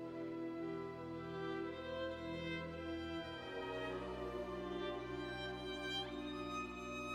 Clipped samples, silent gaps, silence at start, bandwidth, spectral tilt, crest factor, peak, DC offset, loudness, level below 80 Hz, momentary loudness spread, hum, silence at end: under 0.1%; none; 0 s; 14.5 kHz; -5.5 dB/octave; 14 dB; -32 dBFS; under 0.1%; -45 LUFS; -62 dBFS; 3 LU; none; 0 s